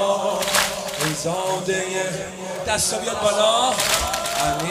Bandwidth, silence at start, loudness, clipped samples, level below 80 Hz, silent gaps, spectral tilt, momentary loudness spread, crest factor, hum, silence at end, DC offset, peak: 16 kHz; 0 s; -21 LUFS; under 0.1%; -46 dBFS; none; -2 dB/octave; 7 LU; 18 dB; none; 0 s; under 0.1%; -2 dBFS